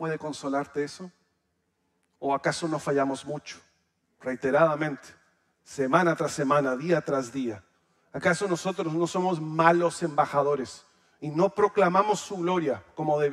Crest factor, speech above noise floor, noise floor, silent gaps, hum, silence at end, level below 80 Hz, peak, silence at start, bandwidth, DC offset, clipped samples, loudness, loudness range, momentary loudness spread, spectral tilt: 24 dB; 49 dB; -75 dBFS; none; none; 0 s; -70 dBFS; -4 dBFS; 0 s; 13.5 kHz; under 0.1%; under 0.1%; -26 LUFS; 6 LU; 15 LU; -5.5 dB/octave